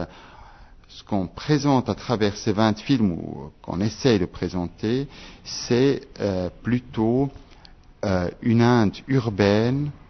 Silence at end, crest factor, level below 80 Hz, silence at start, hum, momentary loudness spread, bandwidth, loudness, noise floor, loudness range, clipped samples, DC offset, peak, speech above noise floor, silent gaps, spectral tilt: 0.1 s; 18 dB; -48 dBFS; 0 s; none; 11 LU; 6.4 kHz; -23 LUFS; -48 dBFS; 3 LU; under 0.1%; under 0.1%; -4 dBFS; 26 dB; none; -6.5 dB/octave